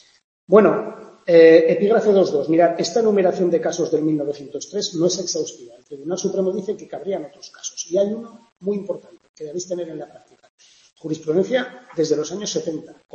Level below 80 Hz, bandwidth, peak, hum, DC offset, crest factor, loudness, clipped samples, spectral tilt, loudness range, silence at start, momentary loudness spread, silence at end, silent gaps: -68 dBFS; 7.6 kHz; 0 dBFS; none; under 0.1%; 20 dB; -19 LUFS; under 0.1%; -5 dB/octave; 12 LU; 0.5 s; 18 LU; 0.2 s; 8.52-8.56 s, 9.29-9.34 s, 10.50-10.58 s